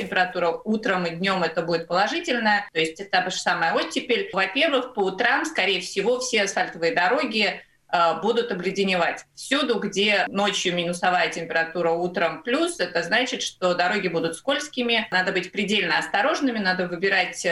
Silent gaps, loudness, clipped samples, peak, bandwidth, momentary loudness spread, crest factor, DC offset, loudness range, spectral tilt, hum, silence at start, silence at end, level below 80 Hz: none; -23 LUFS; under 0.1%; -6 dBFS; 12.5 kHz; 4 LU; 18 dB; under 0.1%; 1 LU; -3.5 dB/octave; none; 0 s; 0 s; -64 dBFS